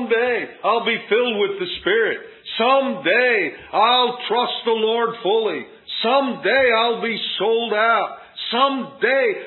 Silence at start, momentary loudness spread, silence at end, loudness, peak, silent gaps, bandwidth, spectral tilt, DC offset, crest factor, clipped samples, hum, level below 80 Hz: 0 s; 7 LU; 0 s; -19 LUFS; -4 dBFS; none; 4.3 kHz; -8.5 dB/octave; under 0.1%; 16 dB; under 0.1%; none; -62 dBFS